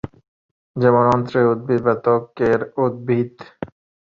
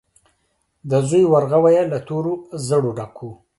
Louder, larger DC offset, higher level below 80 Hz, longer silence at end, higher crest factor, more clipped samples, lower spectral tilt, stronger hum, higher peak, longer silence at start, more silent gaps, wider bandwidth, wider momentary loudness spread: about the same, -18 LUFS vs -18 LUFS; neither; first, -52 dBFS vs -58 dBFS; first, 0.4 s vs 0.25 s; about the same, 18 dB vs 16 dB; neither; first, -9 dB/octave vs -7 dB/octave; neither; about the same, -2 dBFS vs -4 dBFS; about the same, 0.75 s vs 0.85 s; neither; second, 7.2 kHz vs 11.5 kHz; about the same, 19 LU vs 17 LU